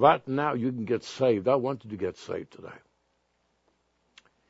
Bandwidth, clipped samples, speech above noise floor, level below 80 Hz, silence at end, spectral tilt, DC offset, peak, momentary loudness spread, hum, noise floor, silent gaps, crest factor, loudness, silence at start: 8 kHz; under 0.1%; 46 dB; -70 dBFS; 1.75 s; -6.5 dB/octave; under 0.1%; -4 dBFS; 16 LU; none; -73 dBFS; none; 24 dB; -28 LUFS; 0 s